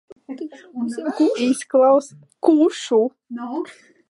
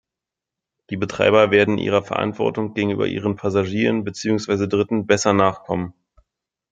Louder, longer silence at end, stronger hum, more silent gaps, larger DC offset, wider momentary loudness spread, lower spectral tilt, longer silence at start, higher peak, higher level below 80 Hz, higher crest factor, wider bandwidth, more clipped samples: about the same, -19 LUFS vs -20 LUFS; second, 0.35 s vs 0.8 s; neither; neither; neither; first, 17 LU vs 11 LU; about the same, -4.5 dB/octave vs -5.5 dB/octave; second, 0.3 s vs 0.9 s; about the same, -2 dBFS vs -2 dBFS; second, -78 dBFS vs -58 dBFS; about the same, 18 dB vs 18 dB; first, 11.5 kHz vs 9.2 kHz; neither